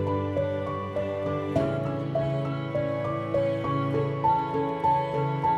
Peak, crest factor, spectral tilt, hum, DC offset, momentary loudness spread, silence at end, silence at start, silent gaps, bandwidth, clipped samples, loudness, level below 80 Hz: -12 dBFS; 14 dB; -8.5 dB/octave; none; under 0.1%; 5 LU; 0 s; 0 s; none; 8 kHz; under 0.1%; -27 LUFS; -54 dBFS